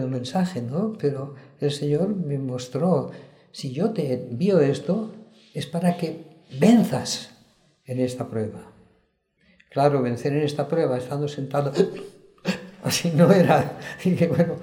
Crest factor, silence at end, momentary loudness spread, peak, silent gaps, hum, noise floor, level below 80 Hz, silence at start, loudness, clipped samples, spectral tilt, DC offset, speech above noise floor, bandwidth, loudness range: 20 dB; 0 s; 16 LU; -4 dBFS; none; none; -67 dBFS; -62 dBFS; 0 s; -23 LUFS; under 0.1%; -6.5 dB/octave; under 0.1%; 44 dB; 16.5 kHz; 4 LU